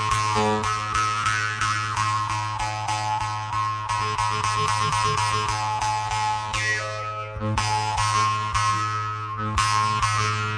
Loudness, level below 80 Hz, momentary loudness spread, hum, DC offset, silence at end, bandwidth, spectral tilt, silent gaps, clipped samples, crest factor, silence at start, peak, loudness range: -24 LUFS; -42 dBFS; 5 LU; none; under 0.1%; 0 s; 11 kHz; -3 dB/octave; none; under 0.1%; 18 dB; 0 s; -6 dBFS; 1 LU